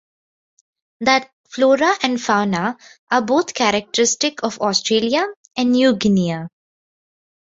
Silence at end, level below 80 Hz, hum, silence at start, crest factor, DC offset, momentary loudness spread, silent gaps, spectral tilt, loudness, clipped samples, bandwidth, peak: 1.1 s; -58 dBFS; none; 1 s; 18 dB; under 0.1%; 9 LU; 1.33-1.44 s, 2.99-3.07 s, 5.36-5.44 s; -3.5 dB/octave; -18 LUFS; under 0.1%; 8 kHz; -2 dBFS